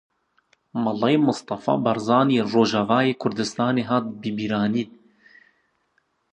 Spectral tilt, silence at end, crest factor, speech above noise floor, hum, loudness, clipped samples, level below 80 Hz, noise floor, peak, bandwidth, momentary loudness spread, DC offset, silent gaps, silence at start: -6 dB/octave; 1.45 s; 20 dB; 48 dB; none; -22 LUFS; under 0.1%; -64 dBFS; -69 dBFS; -4 dBFS; 9.4 kHz; 8 LU; under 0.1%; none; 0.75 s